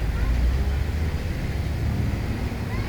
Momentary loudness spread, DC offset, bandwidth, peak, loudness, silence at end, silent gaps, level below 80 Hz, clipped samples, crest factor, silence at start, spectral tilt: 4 LU; under 0.1%; over 20 kHz; -12 dBFS; -26 LUFS; 0 s; none; -26 dBFS; under 0.1%; 12 dB; 0 s; -7 dB/octave